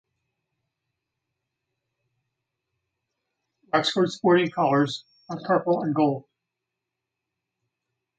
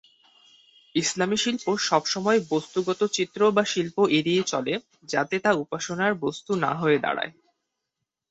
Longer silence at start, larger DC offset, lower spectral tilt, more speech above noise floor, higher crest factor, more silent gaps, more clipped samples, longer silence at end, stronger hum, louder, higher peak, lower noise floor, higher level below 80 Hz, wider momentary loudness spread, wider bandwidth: first, 3.75 s vs 0.95 s; neither; first, -6 dB/octave vs -4 dB/octave; about the same, 62 dB vs 59 dB; about the same, 22 dB vs 20 dB; neither; neither; first, 2 s vs 1 s; neither; about the same, -23 LUFS vs -25 LUFS; about the same, -6 dBFS vs -6 dBFS; about the same, -85 dBFS vs -83 dBFS; second, -74 dBFS vs -68 dBFS; first, 14 LU vs 8 LU; about the same, 9 kHz vs 8.2 kHz